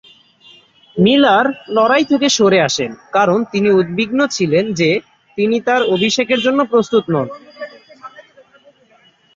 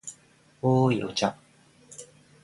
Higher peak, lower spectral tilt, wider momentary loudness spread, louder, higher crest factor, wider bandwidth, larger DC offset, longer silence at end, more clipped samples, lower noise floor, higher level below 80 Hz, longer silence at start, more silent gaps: first, -2 dBFS vs -10 dBFS; second, -4.5 dB/octave vs -6 dB/octave; second, 9 LU vs 22 LU; first, -14 LUFS vs -26 LUFS; second, 14 dB vs 20 dB; second, 7.8 kHz vs 11.5 kHz; neither; first, 1.15 s vs 0.4 s; neither; second, -52 dBFS vs -59 dBFS; first, -58 dBFS vs -64 dBFS; first, 0.95 s vs 0.05 s; neither